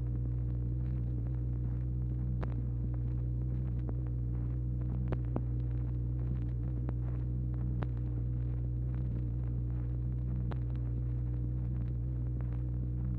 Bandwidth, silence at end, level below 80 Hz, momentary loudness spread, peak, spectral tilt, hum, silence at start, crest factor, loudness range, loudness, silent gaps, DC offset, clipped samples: 2.7 kHz; 0 s; -38 dBFS; 1 LU; -18 dBFS; -12 dB/octave; none; 0 s; 16 dB; 0 LU; -36 LUFS; none; under 0.1%; under 0.1%